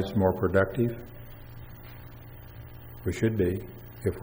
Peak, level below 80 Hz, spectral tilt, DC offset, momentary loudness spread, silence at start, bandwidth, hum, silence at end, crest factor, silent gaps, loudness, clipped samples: -10 dBFS; -48 dBFS; -8 dB/octave; under 0.1%; 21 LU; 0 s; 16.5 kHz; none; 0 s; 20 dB; none; -28 LUFS; under 0.1%